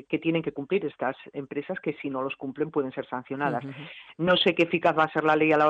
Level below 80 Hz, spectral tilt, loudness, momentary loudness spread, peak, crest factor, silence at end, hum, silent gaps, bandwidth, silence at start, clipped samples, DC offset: -66 dBFS; -7 dB/octave; -27 LUFS; 13 LU; -10 dBFS; 16 dB; 0 s; none; none; 8 kHz; 0.1 s; under 0.1%; under 0.1%